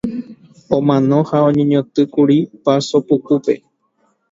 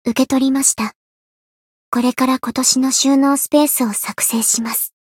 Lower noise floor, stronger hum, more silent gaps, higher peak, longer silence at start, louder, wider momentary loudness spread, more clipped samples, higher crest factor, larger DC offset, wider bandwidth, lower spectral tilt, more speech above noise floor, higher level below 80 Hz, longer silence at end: second, -62 dBFS vs under -90 dBFS; neither; second, none vs 0.96-1.92 s; about the same, 0 dBFS vs -2 dBFS; about the same, 0.05 s vs 0.05 s; about the same, -15 LUFS vs -15 LUFS; about the same, 7 LU vs 6 LU; neither; about the same, 16 dB vs 16 dB; neither; second, 7.8 kHz vs 17 kHz; first, -7.5 dB/octave vs -2 dB/octave; second, 48 dB vs over 74 dB; about the same, -56 dBFS vs -60 dBFS; first, 0.75 s vs 0.15 s